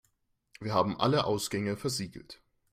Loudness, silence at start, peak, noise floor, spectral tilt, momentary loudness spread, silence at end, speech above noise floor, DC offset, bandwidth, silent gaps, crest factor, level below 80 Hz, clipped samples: -30 LUFS; 0.6 s; -12 dBFS; -75 dBFS; -5 dB/octave; 15 LU; 0.35 s; 44 dB; under 0.1%; 16 kHz; none; 20 dB; -64 dBFS; under 0.1%